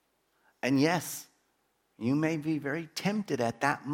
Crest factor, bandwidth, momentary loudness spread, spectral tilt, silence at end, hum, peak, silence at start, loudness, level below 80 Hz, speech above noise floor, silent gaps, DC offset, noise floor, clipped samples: 20 dB; 17 kHz; 9 LU; -5.5 dB/octave; 0 s; none; -10 dBFS; 0.65 s; -31 LUFS; -74 dBFS; 44 dB; none; under 0.1%; -74 dBFS; under 0.1%